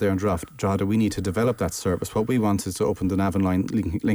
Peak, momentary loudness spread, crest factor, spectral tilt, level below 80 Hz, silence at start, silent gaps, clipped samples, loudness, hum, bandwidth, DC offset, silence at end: -12 dBFS; 4 LU; 12 dB; -6.5 dB/octave; -46 dBFS; 0 s; none; under 0.1%; -24 LUFS; none; over 20 kHz; under 0.1%; 0 s